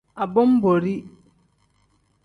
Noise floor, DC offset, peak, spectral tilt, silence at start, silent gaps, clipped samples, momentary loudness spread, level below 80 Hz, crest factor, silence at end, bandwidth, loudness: -64 dBFS; under 0.1%; -6 dBFS; -9.5 dB/octave; 0.15 s; none; under 0.1%; 11 LU; -60 dBFS; 16 dB; 1.15 s; 4.7 kHz; -20 LUFS